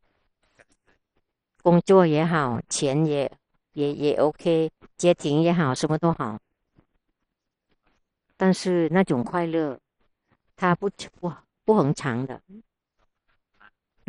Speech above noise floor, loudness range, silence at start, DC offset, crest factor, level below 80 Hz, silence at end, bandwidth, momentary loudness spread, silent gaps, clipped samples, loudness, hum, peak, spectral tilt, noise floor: 58 dB; 5 LU; 1.65 s; under 0.1%; 20 dB; -60 dBFS; 1.5 s; 11 kHz; 12 LU; none; under 0.1%; -23 LUFS; none; -4 dBFS; -6 dB/octave; -81 dBFS